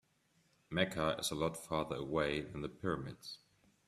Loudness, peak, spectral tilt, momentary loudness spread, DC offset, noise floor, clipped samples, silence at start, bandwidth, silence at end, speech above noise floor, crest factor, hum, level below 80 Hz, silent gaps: -38 LUFS; -18 dBFS; -4.5 dB/octave; 12 LU; under 0.1%; -75 dBFS; under 0.1%; 0.7 s; 15.5 kHz; 0.5 s; 37 dB; 22 dB; none; -62 dBFS; none